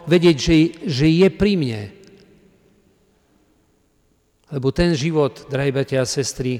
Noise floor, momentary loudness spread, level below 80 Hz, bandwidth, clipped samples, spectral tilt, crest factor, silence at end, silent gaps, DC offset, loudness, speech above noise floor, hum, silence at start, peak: -62 dBFS; 10 LU; -40 dBFS; 14 kHz; under 0.1%; -6 dB/octave; 14 dB; 0 s; none; under 0.1%; -18 LUFS; 44 dB; none; 0 s; -6 dBFS